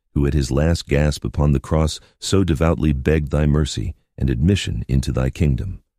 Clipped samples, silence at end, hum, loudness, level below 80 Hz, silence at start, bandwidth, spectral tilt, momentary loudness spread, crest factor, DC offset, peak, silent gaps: under 0.1%; 0.2 s; none; -20 LUFS; -26 dBFS; 0.15 s; 14 kHz; -6.5 dB/octave; 6 LU; 16 dB; under 0.1%; -2 dBFS; none